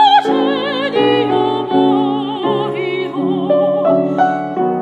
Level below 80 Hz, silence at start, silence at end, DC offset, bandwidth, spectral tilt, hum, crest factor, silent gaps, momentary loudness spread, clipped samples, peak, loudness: -68 dBFS; 0 s; 0 s; under 0.1%; 8.2 kHz; -7 dB/octave; none; 14 dB; none; 5 LU; under 0.1%; 0 dBFS; -15 LUFS